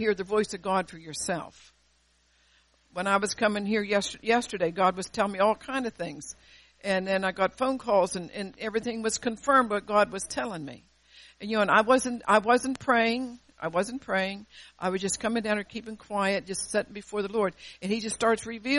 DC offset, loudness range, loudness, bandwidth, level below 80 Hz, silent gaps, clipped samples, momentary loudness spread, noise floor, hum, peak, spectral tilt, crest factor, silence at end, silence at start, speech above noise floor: under 0.1%; 5 LU; -27 LUFS; 11.5 kHz; -60 dBFS; none; under 0.1%; 14 LU; -67 dBFS; none; -6 dBFS; -3.5 dB/octave; 22 dB; 0 s; 0 s; 39 dB